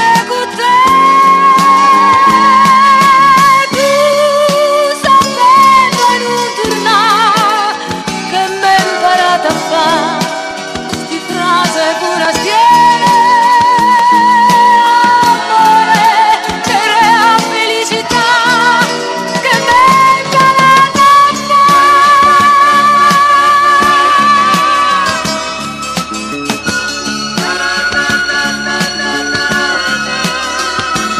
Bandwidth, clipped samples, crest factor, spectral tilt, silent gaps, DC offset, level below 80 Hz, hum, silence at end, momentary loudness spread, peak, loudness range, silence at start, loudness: 15 kHz; under 0.1%; 8 dB; -2.5 dB/octave; none; under 0.1%; -44 dBFS; none; 0 s; 10 LU; 0 dBFS; 7 LU; 0 s; -8 LUFS